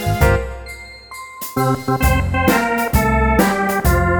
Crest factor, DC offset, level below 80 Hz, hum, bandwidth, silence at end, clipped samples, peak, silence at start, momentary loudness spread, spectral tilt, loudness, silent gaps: 16 dB; under 0.1%; -24 dBFS; none; over 20 kHz; 0 s; under 0.1%; -2 dBFS; 0 s; 17 LU; -6 dB/octave; -16 LUFS; none